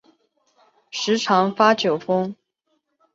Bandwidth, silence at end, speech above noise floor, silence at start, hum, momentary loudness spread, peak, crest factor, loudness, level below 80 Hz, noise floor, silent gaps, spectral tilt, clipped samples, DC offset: 7.8 kHz; 0.8 s; 52 dB; 0.95 s; none; 12 LU; -2 dBFS; 20 dB; -20 LUFS; -70 dBFS; -72 dBFS; none; -4.5 dB/octave; under 0.1%; under 0.1%